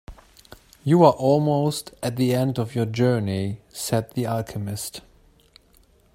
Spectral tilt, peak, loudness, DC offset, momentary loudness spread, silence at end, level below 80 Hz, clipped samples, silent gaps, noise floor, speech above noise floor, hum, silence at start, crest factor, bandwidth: -6.5 dB/octave; -2 dBFS; -23 LUFS; under 0.1%; 14 LU; 1.15 s; -54 dBFS; under 0.1%; none; -57 dBFS; 35 dB; none; 0.1 s; 22 dB; 16 kHz